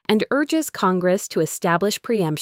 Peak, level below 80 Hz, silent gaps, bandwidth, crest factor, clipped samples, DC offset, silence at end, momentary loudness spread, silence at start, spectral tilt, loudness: -4 dBFS; -64 dBFS; none; 16.5 kHz; 16 dB; under 0.1%; under 0.1%; 0 s; 3 LU; 0.1 s; -5 dB/octave; -21 LUFS